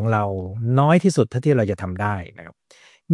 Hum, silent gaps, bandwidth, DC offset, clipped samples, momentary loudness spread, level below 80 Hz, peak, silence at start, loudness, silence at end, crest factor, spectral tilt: none; none; 11.5 kHz; under 0.1%; under 0.1%; 10 LU; -58 dBFS; -4 dBFS; 0 s; -20 LUFS; 0 s; 16 dB; -7.5 dB/octave